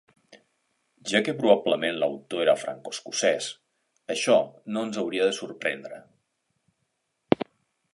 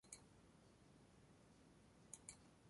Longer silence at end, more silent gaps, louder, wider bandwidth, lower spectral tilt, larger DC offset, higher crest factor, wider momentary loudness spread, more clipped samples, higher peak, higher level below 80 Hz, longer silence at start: first, 0.5 s vs 0 s; neither; first, -26 LUFS vs -64 LUFS; about the same, 11.5 kHz vs 11.5 kHz; about the same, -3.5 dB/octave vs -3 dB/octave; neither; about the same, 26 dB vs 30 dB; first, 16 LU vs 11 LU; neither; first, -2 dBFS vs -36 dBFS; first, -72 dBFS vs -80 dBFS; first, 1.05 s vs 0.05 s